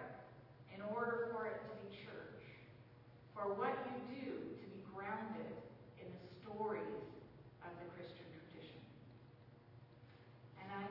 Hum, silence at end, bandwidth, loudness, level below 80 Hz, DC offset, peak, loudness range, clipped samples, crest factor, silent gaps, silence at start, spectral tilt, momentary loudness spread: none; 0 s; 5.8 kHz; -48 LUFS; -78 dBFS; under 0.1%; -28 dBFS; 10 LU; under 0.1%; 20 dB; none; 0 s; -5 dB/octave; 21 LU